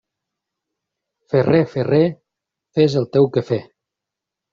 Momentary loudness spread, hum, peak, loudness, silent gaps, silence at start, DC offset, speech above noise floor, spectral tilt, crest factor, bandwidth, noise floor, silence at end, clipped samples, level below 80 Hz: 8 LU; none; -2 dBFS; -18 LUFS; none; 1.3 s; under 0.1%; 68 dB; -7 dB/octave; 18 dB; 7.4 kHz; -84 dBFS; 0.9 s; under 0.1%; -58 dBFS